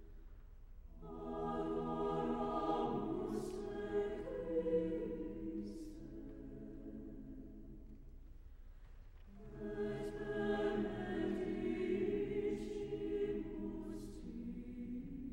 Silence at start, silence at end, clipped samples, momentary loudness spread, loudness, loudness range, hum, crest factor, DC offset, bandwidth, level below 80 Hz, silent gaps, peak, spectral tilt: 0 s; 0 s; under 0.1%; 23 LU; -42 LUFS; 13 LU; none; 16 dB; under 0.1%; 16 kHz; -56 dBFS; none; -26 dBFS; -7.5 dB/octave